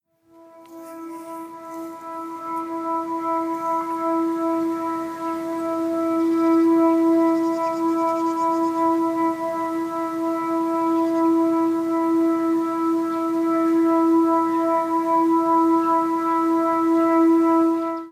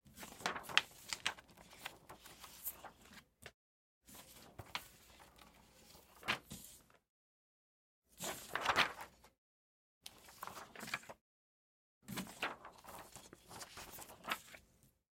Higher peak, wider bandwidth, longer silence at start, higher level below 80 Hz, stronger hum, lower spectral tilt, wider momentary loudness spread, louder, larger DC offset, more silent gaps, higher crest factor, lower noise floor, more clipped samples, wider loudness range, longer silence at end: about the same, -8 dBFS vs -8 dBFS; second, 14.5 kHz vs 16.5 kHz; first, 0.55 s vs 0.05 s; about the same, -70 dBFS vs -74 dBFS; neither; first, -6 dB/octave vs -1.5 dB/octave; second, 12 LU vs 25 LU; first, -21 LUFS vs -43 LUFS; neither; second, none vs 3.54-4.01 s, 7.09-8.02 s, 9.38-10.01 s, 11.21-12.01 s; second, 12 dB vs 38 dB; second, -51 dBFS vs -72 dBFS; neither; second, 6 LU vs 11 LU; second, 0 s vs 0.25 s